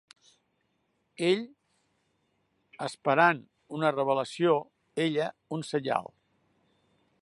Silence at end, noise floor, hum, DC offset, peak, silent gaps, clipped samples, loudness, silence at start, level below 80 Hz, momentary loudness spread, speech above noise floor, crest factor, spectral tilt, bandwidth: 1.15 s; -75 dBFS; none; under 0.1%; -8 dBFS; none; under 0.1%; -29 LUFS; 1.2 s; -80 dBFS; 15 LU; 47 dB; 24 dB; -5.5 dB/octave; 11.5 kHz